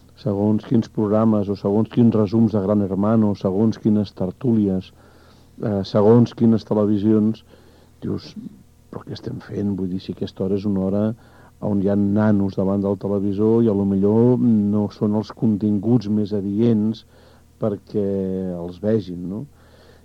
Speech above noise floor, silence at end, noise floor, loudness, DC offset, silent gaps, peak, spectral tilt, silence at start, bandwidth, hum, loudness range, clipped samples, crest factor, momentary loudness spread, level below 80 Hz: 30 dB; 0.6 s; -49 dBFS; -20 LUFS; 0.1%; none; -2 dBFS; -10 dB/octave; 0.25 s; 6.6 kHz; none; 7 LU; under 0.1%; 16 dB; 13 LU; -54 dBFS